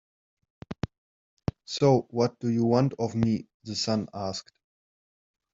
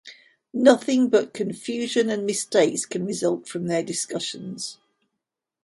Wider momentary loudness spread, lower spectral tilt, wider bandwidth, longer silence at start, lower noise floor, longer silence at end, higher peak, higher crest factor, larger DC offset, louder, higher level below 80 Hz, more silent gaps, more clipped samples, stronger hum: about the same, 14 LU vs 13 LU; first, -6.5 dB/octave vs -4 dB/octave; second, 7.8 kHz vs 11.5 kHz; first, 0.7 s vs 0.05 s; first, under -90 dBFS vs -83 dBFS; first, 1.15 s vs 0.9 s; second, -8 dBFS vs -2 dBFS; about the same, 20 dB vs 22 dB; neither; second, -28 LUFS vs -23 LUFS; first, -58 dBFS vs -70 dBFS; first, 0.98-1.37 s, 3.54-3.60 s vs none; neither; neither